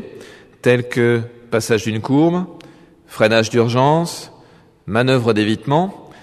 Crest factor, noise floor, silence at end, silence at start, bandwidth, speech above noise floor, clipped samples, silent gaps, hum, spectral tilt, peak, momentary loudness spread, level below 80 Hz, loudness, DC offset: 18 dB; -48 dBFS; 0.15 s; 0 s; 13.5 kHz; 32 dB; under 0.1%; none; none; -6 dB/octave; 0 dBFS; 11 LU; -56 dBFS; -17 LUFS; under 0.1%